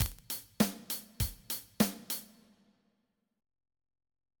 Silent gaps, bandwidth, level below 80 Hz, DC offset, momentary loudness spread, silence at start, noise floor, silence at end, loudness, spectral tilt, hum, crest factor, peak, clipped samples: none; 19.5 kHz; -50 dBFS; under 0.1%; 8 LU; 0 s; -80 dBFS; 2.15 s; -35 LUFS; -4 dB/octave; none; 32 dB; -6 dBFS; under 0.1%